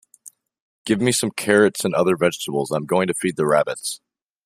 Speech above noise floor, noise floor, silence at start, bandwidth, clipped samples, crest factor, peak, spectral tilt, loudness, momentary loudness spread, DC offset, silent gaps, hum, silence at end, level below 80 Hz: 29 dB; -48 dBFS; 0.85 s; 15.5 kHz; under 0.1%; 20 dB; 0 dBFS; -4.5 dB/octave; -20 LUFS; 10 LU; under 0.1%; none; none; 0.5 s; -62 dBFS